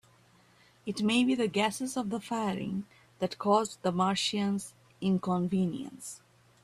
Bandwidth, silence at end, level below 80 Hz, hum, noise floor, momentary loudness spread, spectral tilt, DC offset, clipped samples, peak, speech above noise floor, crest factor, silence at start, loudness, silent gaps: 13.5 kHz; 0.45 s; -68 dBFS; none; -62 dBFS; 15 LU; -5 dB/octave; under 0.1%; under 0.1%; -12 dBFS; 32 dB; 18 dB; 0.85 s; -31 LUFS; none